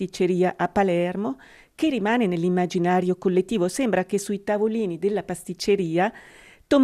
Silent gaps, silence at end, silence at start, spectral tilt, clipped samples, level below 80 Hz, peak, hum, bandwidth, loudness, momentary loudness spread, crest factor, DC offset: none; 0 s; 0 s; -6 dB/octave; under 0.1%; -56 dBFS; -6 dBFS; none; 14 kHz; -24 LUFS; 5 LU; 16 dB; under 0.1%